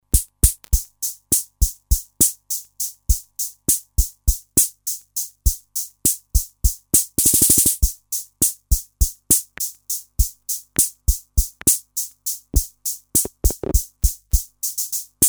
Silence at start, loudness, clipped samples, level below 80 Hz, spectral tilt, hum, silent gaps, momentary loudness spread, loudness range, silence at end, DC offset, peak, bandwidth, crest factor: 0.15 s; -20 LUFS; under 0.1%; -24 dBFS; -3 dB/octave; 50 Hz at -40 dBFS; none; 10 LU; 4 LU; 0 s; under 0.1%; 0 dBFS; over 20 kHz; 20 dB